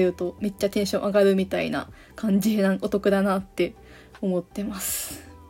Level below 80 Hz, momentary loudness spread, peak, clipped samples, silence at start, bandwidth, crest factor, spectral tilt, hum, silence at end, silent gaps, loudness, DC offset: -52 dBFS; 11 LU; -8 dBFS; under 0.1%; 0 s; 16.5 kHz; 16 dB; -5.5 dB/octave; none; 0 s; none; -25 LUFS; under 0.1%